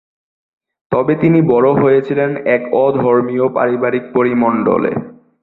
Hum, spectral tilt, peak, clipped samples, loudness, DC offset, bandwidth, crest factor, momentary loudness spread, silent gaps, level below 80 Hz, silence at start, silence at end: none; -11 dB/octave; -2 dBFS; under 0.1%; -14 LUFS; under 0.1%; 4.2 kHz; 12 dB; 6 LU; none; -52 dBFS; 0.9 s; 0.3 s